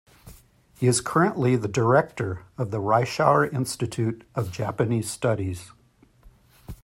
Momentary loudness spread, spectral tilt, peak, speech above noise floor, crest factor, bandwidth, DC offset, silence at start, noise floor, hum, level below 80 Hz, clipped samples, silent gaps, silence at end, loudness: 11 LU; -5.5 dB/octave; -4 dBFS; 35 dB; 20 dB; 16 kHz; under 0.1%; 0.25 s; -58 dBFS; none; -56 dBFS; under 0.1%; none; 0.1 s; -24 LUFS